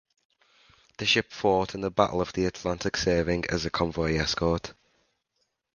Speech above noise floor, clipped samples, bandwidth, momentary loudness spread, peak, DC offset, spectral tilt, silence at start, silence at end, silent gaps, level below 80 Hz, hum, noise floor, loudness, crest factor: 50 dB; under 0.1%; 10 kHz; 5 LU; -6 dBFS; under 0.1%; -4.5 dB/octave; 1 s; 1.05 s; none; -46 dBFS; none; -77 dBFS; -27 LUFS; 24 dB